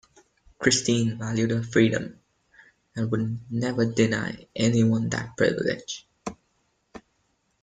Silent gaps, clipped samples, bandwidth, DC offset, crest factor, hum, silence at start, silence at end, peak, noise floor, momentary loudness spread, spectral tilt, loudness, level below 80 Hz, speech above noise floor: none; under 0.1%; 9.4 kHz; under 0.1%; 22 dB; none; 0.6 s; 0.65 s; -4 dBFS; -71 dBFS; 14 LU; -5 dB/octave; -25 LUFS; -58 dBFS; 47 dB